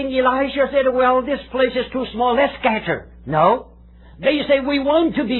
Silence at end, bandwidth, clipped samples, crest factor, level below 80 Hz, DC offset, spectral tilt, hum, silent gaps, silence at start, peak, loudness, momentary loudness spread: 0 s; 4.3 kHz; under 0.1%; 16 dB; -44 dBFS; under 0.1%; -9 dB/octave; none; none; 0 s; -2 dBFS; -18 LUFS; 7 LU